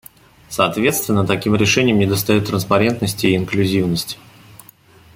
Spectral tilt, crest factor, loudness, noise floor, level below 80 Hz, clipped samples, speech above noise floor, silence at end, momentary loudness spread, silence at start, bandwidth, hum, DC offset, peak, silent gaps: -5 dB/octave; 16 dB; -17 LUFS; -47 dBFS; -48 dBFS; under 0.1%; 30 dB; 1 s; 7 LU; 0.5 s; 17 kHz; none; under 0.1%; -2 dBFS; none